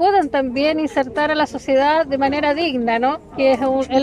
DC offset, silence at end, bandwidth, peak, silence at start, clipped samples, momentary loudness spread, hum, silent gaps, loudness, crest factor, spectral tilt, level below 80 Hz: under 0.1%; 0 s; 10.5 kHz; -6 dBFS; 0 s; under 0.1%; 4 LU; none; none; -18 LUFS; 12 dB; -5 dB/octave; -48 dBFS